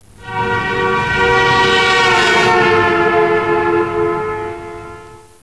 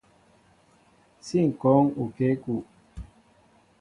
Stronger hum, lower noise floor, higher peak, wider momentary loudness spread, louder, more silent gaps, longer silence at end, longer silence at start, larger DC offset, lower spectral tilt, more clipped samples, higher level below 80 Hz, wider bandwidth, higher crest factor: neither; second, -36 dBFS vs -60 dBFS; about the same, -4 dBFS vs -6 dBFS; second, 15 LU vs 25 LU; first, -13 LUFS vs -25 LUFS; neither; second, 0.3 s vs 0.75 s; second, 0.2 s vs 1.25 s; first, 0.4% vs under 0.1%; second, -4 dB/octave vs -8.5 dB/octave; neither; first, -40 dBFS vs -54 dBFS; about the same, 11 kHz vs 11 kHz; second, 12 dB vs 22 dB